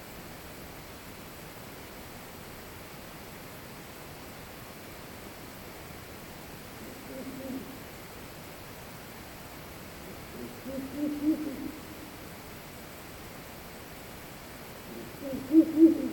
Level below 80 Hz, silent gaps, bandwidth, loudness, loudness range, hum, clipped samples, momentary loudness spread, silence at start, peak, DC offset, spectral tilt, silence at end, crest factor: -56 dBFS; none; 18.5 kHz; -36 LUFS; 7 LU; none; under 0.1%; 13 LU; 0 s; -10 dBFS; under 0.1%; -5.5 dB/octave; 0 s; 24 dB